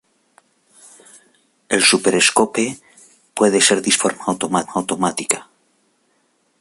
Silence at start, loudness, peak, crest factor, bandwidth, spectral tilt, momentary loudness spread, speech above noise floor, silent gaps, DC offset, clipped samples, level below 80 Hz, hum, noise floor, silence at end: 1.7 s; -16 LUFS; 0 dBFS; 20 dB; 12 kHz; -2 dB/octave; 10 LU; 46 dB; none; under 0.1%; under 0.1%; -62 dBFS; none; -63 dBFS; 1.2 s